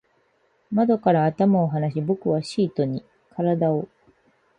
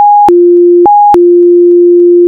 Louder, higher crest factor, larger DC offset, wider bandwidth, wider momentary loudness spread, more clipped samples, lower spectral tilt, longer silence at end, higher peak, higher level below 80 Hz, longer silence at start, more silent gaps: second, -22 LUFS vs -4 LUFS; first, 16 dB vs 4 dB; neither; first, 10 kHz vs 2.3 kHz; first, 9 LU vs 0 LU; second, under 0.1% vs 0.2%; about the same, -8.5 dB/octave vs -8.5 dB/octave; first, 0.75 s vs 0 s; second, -6 dBFS vs 0 dBFS; second, -64 dBFS vs -46 dBFS; first, 0.7 s vs 0 s; neither